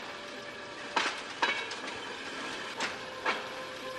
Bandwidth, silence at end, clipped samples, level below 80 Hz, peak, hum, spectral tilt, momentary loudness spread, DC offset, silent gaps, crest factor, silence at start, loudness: 13 kHz; 0 s; under 0.1%; -72 dBFS; -14 dBFS; none; -1.5 dB/octave; 10 LU; under 0.1%; none; 22 dB; 0 s; -35 LUFS